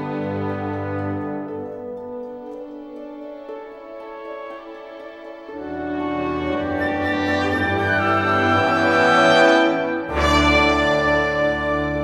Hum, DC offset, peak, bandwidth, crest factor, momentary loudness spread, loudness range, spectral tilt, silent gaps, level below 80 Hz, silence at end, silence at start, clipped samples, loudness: none; under 0.1%; -2 dBFS; 13 kHz; 18 dB; 20 LU; 18 LU; -5.5 dB/octave; none; -40 dBFS; 0 s; 0 s; under 0.1%; -19 LUFS